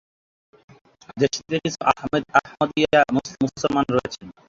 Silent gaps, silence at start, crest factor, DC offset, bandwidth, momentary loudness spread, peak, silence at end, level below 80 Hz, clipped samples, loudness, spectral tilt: none; 1.15 s; 22 dB; under 0.1%; 7.8 kHz; 7 LU; -2 dBFS; 0.2 s; -54 dBFS; under 0.1%; -22 LUFS; -5 dB/octave